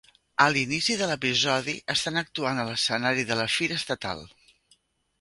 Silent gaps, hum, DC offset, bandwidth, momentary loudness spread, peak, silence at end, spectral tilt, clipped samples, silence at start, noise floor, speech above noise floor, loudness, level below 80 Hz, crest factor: none; none; under 0.1%; 11.5 kHz; 8 LU; -2 dBFS; 0.95 s; -3 dB/octave; under 0.1%; 0.4 s; -66 dBFS; 39 dB; -25 LUFS; -62 dBFS; 24 dB